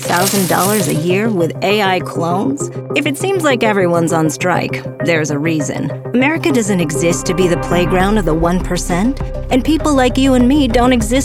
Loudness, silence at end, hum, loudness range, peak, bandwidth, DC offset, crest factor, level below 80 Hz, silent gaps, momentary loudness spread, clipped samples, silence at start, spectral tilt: -14 LUFS; 0 s; none; 2 LU; 0 dBFS; over 20 kHz; under 0.1%; 14 dB; -28 dBFS; none; 6 LU; under 0.1%; 0 s; -5 dB/octave